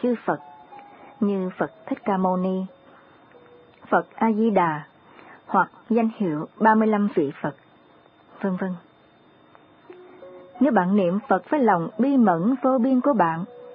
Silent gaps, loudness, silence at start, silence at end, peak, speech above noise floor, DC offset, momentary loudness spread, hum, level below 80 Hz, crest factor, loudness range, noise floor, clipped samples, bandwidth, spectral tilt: none; -23 LUFS; 0 s; 0 s; -4 dBFS; 33 dB; under 0.1%; 11 LU; none; -72 dBFS; 18 dB; 7 LU; -55 dBFS; under 0.1%; 4.7 kHz; -12 dB/octave